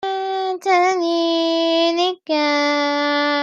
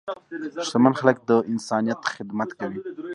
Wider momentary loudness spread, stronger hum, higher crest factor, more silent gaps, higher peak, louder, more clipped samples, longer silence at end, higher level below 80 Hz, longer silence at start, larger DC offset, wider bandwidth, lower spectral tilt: second, 6 LU vs 14 LU; neither; second, 14 dB vs 22 dB; neither; second, -6 dBFS vs -2 dBFS; first, -18 LUFS vs -24 LUFS; neither; about the same, 0 s vs 0 s; second, -78 dBFS vs -70 dBFS; about the same, 0 s vs 0.05 s; neither; second, 9.4 kHz vs 11 kHz; second, -1.5 dB/octave vs -5.5 dB/octave